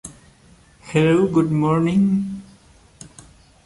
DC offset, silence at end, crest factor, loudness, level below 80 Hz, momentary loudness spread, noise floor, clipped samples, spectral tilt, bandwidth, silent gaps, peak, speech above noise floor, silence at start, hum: under 0.1%; 1.25 s; 16 dB; -19 LUFS; -50 dBFS; 15 LU; -51 dBFS; under 0.1%; -7.5 dB/octave; 11.5 kHz; none; -4 dBFS; 34 dB; 0.05 s; none